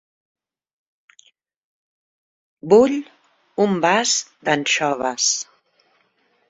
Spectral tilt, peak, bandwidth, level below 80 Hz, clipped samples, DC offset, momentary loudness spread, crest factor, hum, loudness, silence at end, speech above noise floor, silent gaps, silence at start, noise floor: -2.5 dB/octave; -2 dBFS; 8 kHz; -64 dBFS; under 0.1%; under 0.1%; 14 LU; 20 dB; none; -18 LUFS; 1.05 s; 46 dB; none; 2.65 s; -64 dBFS